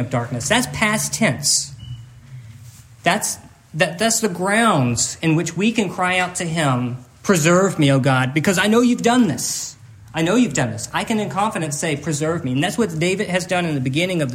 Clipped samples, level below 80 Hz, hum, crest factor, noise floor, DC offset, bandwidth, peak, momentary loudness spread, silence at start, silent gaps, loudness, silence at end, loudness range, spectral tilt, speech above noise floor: under 0.1%; -54 dBFS; none; 18 dB; -42 dBFS; under 0.1%; 16 kHz; -2 dBFS; 8 LU; 0 s; none; -19 LUFS; 0 s; 4 LU; -4 dB/octave; 23 dB